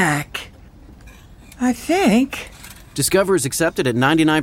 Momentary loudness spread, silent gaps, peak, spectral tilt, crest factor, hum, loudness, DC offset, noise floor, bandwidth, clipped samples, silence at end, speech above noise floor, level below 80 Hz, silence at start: 15 LU; none; -4 dBFS; -4.5 dB/octave; 16 dB; none; -18 LUFS; under 0.1%; -43 dBFS; 17 kHz; under 0.1%; 0 s; 25 dB; -44 dBFS; 0 s